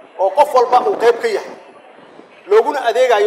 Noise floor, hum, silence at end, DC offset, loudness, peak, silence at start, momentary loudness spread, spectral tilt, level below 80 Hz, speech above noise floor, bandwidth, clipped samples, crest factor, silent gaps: -41 dBFS; none; 0 s; under 0.1%; -14 LUFS; 0 dBFS; 0.15 s; 8 LU; -2.5 dB/octave; -70 dBFS; 28 dB; 15 kHz; under 0.1%; 16 dB; none